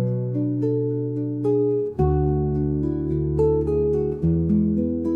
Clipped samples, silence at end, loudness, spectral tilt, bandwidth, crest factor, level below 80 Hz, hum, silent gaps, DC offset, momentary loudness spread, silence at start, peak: under 0.1%; 0 s; -22 LUFS; -12.5 dB/octave; 2.8 kHz; 14 dB; -36 dBFS; none; none; under 0.1%; 4 LU; 0 s; -8 dBFS